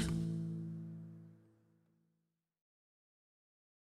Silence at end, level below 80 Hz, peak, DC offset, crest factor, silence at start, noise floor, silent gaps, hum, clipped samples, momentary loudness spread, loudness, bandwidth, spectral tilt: 2.5 s; -60 dBFS; -24 dBFS; under 0.1%; 20 dB; 0 s; -86 dBFS; none; none; under 0.1%; 19 LU; -43 LUFS; 12.5 kHz; -6.5 dB/octave